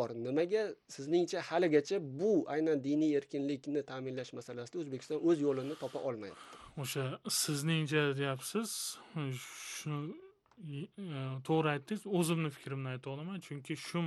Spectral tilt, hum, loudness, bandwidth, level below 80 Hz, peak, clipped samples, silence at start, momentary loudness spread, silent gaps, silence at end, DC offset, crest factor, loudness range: -5 dB/octave; none; -36 LUFS; 12.5 kHz; -78 dBFS; -16 dBFS; under 0.1%; 0 s; 13 LU; none; 0 s; under 0.1%; 20 dB; 6 LU